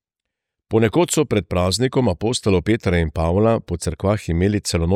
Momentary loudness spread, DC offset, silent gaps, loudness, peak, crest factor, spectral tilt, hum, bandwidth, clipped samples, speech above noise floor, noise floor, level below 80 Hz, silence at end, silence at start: 4 LU; under 0.1%; none; -19 LUFS; -4 dBFS; 14 dB; -5.5 dB/octave; none; 15.5 kHz; under 0.1%; 64 dB; -83 dBFS; -36 dBFS; 0 s; 0.7 s